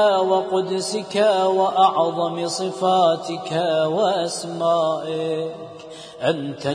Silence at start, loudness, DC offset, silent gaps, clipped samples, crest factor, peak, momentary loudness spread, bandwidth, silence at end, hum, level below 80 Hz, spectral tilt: 0 s; -21 LUFS; under 0.1%; none; under 0.1%; 16 dB; -6 dBFS; 9 LU; 10.5 kHz; 0 s; none; -68 dBFS; -4.5 dB/octave